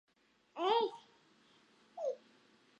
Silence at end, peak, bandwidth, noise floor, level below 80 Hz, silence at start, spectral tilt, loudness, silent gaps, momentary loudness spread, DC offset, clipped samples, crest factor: 0.65 s; -20 dBFS; 8.4 kHz; -69 dBFS; under -90 dBFS; 0.55 s; -3.5 dB/octave; -37 LUFS; none; 22 LU; under 0.1%; under 0.1%; 20 dB